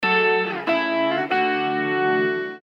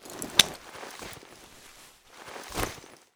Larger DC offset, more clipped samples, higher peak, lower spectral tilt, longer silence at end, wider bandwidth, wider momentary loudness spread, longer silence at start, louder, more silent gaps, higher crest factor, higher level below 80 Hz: neither; neither; second, -8 dBFS vs -2 dBFS; first, -6.5 dB/octave vs -0.5 dB/octave; second, 0.05 s vs 0.2 s; second, 7 kHz vs over 20 kHz; second, 4 LU vs 27 LU; about the same, 0 s vs 0 s; first, -21 LUFS vs -26 LUFS; neither; second, 14 dB vs 32 dB; second, -68 dBFS vs -52 dBFS